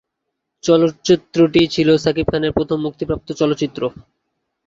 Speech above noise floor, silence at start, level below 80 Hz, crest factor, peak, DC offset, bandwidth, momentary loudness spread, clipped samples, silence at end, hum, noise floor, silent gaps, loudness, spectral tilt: 61 dB; 0.65 s; -44 dBFS; 16 dB; -2 dBFS; under 0.1%; 7.6 kHz; 10 LU; under 0.1%; 0.8 s; none; -77 dBFS; none; -17 LUFS; -6 dB/octave